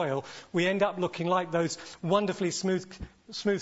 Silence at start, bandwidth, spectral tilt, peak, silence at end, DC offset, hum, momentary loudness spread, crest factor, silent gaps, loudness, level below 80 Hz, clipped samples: 0 s; 8 kHz; -5 dB/octave; -10 dBFS; 0 s; under 0.1%; none; 9 LU; 18 dB; none; -29 LUFS; -58 dBFS; under 0.1%